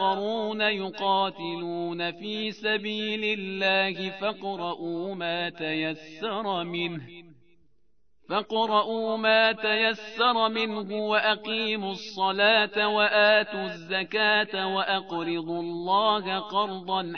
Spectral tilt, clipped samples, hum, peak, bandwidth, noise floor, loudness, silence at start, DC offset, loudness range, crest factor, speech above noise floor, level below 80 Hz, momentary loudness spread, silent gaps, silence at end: -5 dB/octave; under 0.1%; none; -8 dBFS; 6.6 kHz; -71 dBFS; -26 LUFS; 0 s; 0.1%; 8 LU; 20 dB; 45 dB; -72 dBFS; 11 LU; none; 0 s